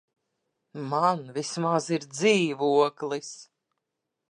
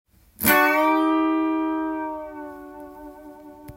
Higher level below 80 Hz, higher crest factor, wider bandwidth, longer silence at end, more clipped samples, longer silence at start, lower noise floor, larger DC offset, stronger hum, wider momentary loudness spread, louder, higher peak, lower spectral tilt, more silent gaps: second, -80 dBFS vs -56 dBFS; about the same, 18 dB vs 22 dB; second, 10.5 kHz vs 16.5 kHz; first, 0.9 s vs 0 s; neither; first, 0.75 s vs 0.4 s; first, -84 dBFS vs -43 dBFS; neither; neither; second, 16 LU vs 23 LU; second, -26 LUFS vs -21 LUFS; second, -10 dBFS vs -2 dBFS; about the same, -4.5 dB/octave vs -3.5 dB/octave; neither